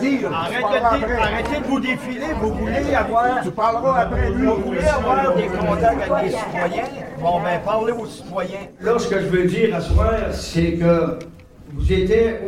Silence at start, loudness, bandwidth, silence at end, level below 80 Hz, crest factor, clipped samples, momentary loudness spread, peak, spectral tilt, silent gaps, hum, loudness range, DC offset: 0 s; -20 LUFS; 15 kHz; 0 s; -30 dBFS; 14 dB; under 0.1%; 8 LU; -4 dBFS; -6.5 dB/octave; none; none; 3 LU; 0.1%